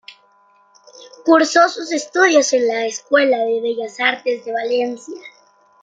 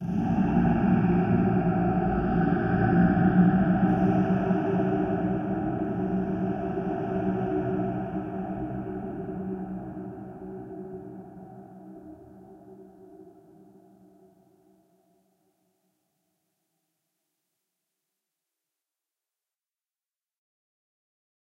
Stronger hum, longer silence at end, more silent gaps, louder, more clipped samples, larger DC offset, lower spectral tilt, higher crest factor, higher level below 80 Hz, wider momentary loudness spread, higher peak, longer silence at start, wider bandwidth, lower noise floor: neither; second, 0.55 s vs 8.15 s; neither; first, -17 LUFS vs -26 LUFS; neither; neither; second, -1.5 dB/octave vs -10.5 dB/octave; about the same, 16 dB vs 20 dB; second, -72 dBFS vs -46 dBFS; second, 11 LU vs 19 LU; first, -2 dBFS vs -10 dBFS; about the same, 0.1 s vs 0 s; first, 9.4 kHz vs 3.6 kHz; second, -54 dBFS vs under -90 dBFS